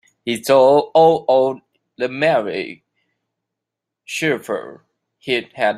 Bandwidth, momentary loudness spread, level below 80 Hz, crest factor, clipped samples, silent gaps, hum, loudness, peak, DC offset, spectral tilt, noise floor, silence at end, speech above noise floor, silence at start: 15.5 kHz; 15 LU; -66 dBFS; 16 dB; under 0.1%; none; none; -17 LUFS; -2 dBFS; under 0.1%; -4.5 dB/octave; -83 dBFS; 0 s; 66 dB; 0.25 s